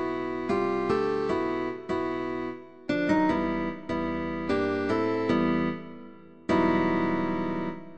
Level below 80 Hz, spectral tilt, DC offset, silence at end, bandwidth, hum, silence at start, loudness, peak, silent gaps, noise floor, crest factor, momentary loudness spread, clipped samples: -54 dBFS; -7.5 dB/octave; 0.3%; 0 s; 8.6 kHz; none; 0 s; -28 LUFS; -12 dBFS; none; -48 dBFS; 16 dB; 9 LU; under 0.1%